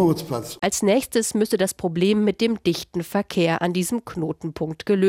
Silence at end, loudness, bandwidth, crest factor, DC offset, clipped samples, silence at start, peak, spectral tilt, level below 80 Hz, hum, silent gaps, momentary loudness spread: 0 s; -23 LUFS; 16 kHz; 14 dB; under 0.1%; under 0.1%; 0 s; -8 dBFS; -5 dB/octave; -56 dBFS; none; none; 9 LU